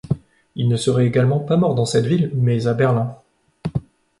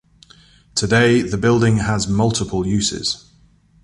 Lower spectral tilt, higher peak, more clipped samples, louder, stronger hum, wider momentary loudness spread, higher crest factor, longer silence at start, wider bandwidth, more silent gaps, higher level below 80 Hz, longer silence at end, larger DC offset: first, -7 dB/octave vs -5 dB/octave; about the same, -4 dBFS vs -2 dBFS; neither; about the same, -19 LUFS vs -18 LUFS; neither; about the same, 11 LU vs 9 LU; about the same, 14 dB vs 16 dB; second, 0.05 s vs 0.75 s; about the same, 11.5 kHz vs 11.5 kHz; neither; second, -48 dBFS vs -40 dBFS; second, 0.4 s vs 0.65 s; neither